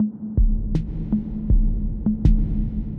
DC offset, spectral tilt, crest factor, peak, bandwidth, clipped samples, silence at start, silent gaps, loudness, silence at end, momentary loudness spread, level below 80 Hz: under 0.1%; -11 dB/octave; 16 dB; -4 dBFS; 2.6 kHz; under 0.1%; 0 s; none; -24 LUFS; 0 s; 6 LU; -22 dBFS